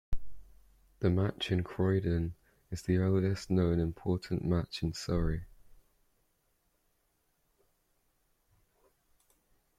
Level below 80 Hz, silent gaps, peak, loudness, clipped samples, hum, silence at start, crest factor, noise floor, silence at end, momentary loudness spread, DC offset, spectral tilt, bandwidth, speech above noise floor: -48 dBFS; none; -16 dBFS; -33 LUFS; under 0.1%; none; 0.1 s; 20 dB; -76 dBFS; 4.05 s; 11 LU; under 0.1%; -7 dB/octave; 12.5 kHz; 45 dB